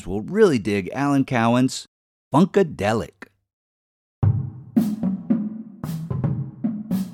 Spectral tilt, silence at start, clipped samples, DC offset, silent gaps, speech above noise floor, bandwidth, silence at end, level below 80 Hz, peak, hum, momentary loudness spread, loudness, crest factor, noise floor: -7 dB/octave; 0 s; under 0.1%; under 0.1%; 1.88-2.31 s, 3.53-4.22 s; over 70 dB; 17.5 kHz; 0 s; -48 dBFS; -2 dBFS; none; 11 LU; -22 LUFS; 20 dB; under -90 dBFS